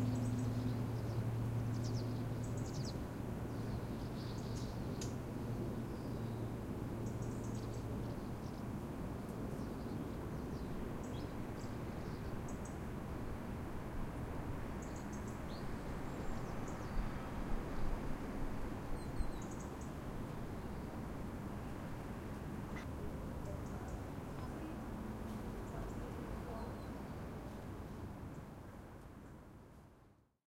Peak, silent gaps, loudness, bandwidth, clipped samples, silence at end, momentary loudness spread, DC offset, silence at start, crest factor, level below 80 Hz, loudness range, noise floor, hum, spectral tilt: -24 dBFS; none; -45 LUFS; 16 kHz; under 0.1%; 0.4 s; 7 LU; under 0.1%; 0 s; 18 dB; -50 dBFS; 4 LU; -67 dBFS; none; -7 dB/octave